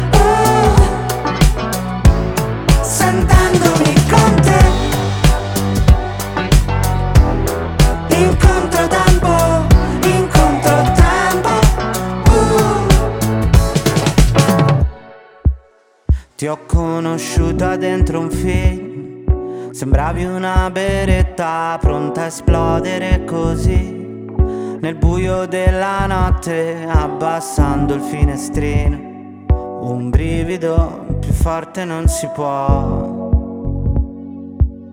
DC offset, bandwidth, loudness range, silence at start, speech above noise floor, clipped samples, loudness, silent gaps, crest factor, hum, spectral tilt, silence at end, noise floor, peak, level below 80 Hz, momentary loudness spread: under 0.1%; 17.5 kHz; 6 LU; 0 s; 35 dB; under 0.1%; -15 LUFS; none; 14 dB; none; -6 dB/octave; 0.05 s; -50 dBFS; 0 dBFS; -18 dBFS; 9 LU